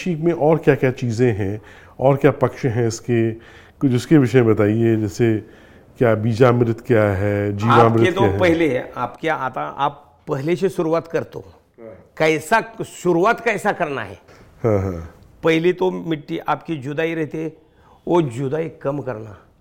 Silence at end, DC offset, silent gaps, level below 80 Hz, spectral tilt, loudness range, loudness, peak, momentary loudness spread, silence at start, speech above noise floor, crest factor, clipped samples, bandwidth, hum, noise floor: 0.25 s; under 0.1%; none; -50 dBFS; -7 dB/octave; 6 LU; -19 LUFS; 0 dBFS; 12 LU; 0 s; 23 dB; 18 dB; under 0.1%; 16.5 kHz; none; -41 dBFS